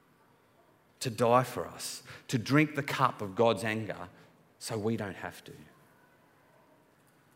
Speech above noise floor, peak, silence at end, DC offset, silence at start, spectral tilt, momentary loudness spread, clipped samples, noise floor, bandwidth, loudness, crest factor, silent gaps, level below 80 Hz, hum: 34 dB; -10 dBFS; 1.7 s; under 0.1%; 1 s; -5.5 dB/octave; 17 LU; under 0.1%; -65 dBFS; 16 kHz; -31 LUFS; 24 dB; none; -74 dBFS; none